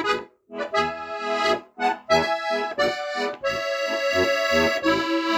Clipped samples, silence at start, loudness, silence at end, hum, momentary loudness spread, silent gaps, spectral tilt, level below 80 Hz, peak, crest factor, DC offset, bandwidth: under 0.1%; 0 s; -23 LUFS; 0 s; none; 7 LU; none; -3.5 dB/octave; -54 dBFS; -6 dBFS; 18 dB; under 0.1%; over 20 kHz